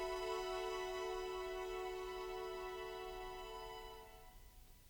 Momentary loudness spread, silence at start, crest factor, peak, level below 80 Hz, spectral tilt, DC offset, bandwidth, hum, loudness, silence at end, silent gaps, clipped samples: 16 LU; 0 s; 14 dB; -32 dBFS; -60 dBFS; -3.5 dB/octave; under 0.1%; over 20 kHz; none; -46 LUFS; 0 s; none; under 0.1%